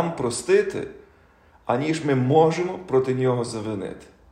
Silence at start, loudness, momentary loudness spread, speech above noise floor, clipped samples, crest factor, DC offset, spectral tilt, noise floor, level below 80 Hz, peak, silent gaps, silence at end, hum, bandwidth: 0 s; -23 LUFS; 16 LU; 33 dB; under 0.1%; 18 dB; under 0.1%; -6 dB/octave; -55 dBFS; -58 dBFS; -4 dBFS; none; 0.3 s; none; 12 kHz